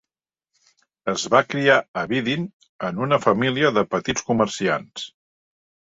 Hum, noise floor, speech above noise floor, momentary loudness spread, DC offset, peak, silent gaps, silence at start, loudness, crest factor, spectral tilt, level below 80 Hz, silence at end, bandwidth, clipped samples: none; -88 dBFS; 67 dB; 13 LU; under 0.1%; -2 dBFS; 1.88-1.94 s, 2.53-2.60 s, 2.69-2.79 s; 1.05 s; -21 LUFS; 22 dB; -4.5 dB/octave; -58 dBFS; 0.9 s; 8 kHz; under 0.1%